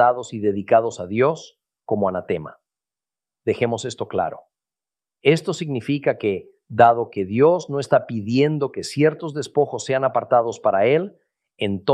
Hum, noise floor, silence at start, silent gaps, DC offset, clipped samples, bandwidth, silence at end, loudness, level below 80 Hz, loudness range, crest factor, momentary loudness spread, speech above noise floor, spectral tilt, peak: none; under -90 dBFS; 0 s; none; under 0.1%; under 0.1%; 12 kHz; 0 s; -21 LUFS; -64 dBFS; 7 LU; 20 dB; 11 LU; over 70 dB; -6 dB/octave; -2 dBFS